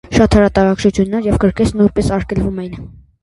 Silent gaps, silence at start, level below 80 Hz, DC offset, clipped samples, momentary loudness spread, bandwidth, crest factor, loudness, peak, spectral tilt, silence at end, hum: none; 0.1 s; -28 dBFS; under 0.1%; under 0.1%; 11 LU; 11.5 kHz; 14 dB; -14 LUFS; 0 dBFS; -7 dB/octave; 0.3 s; none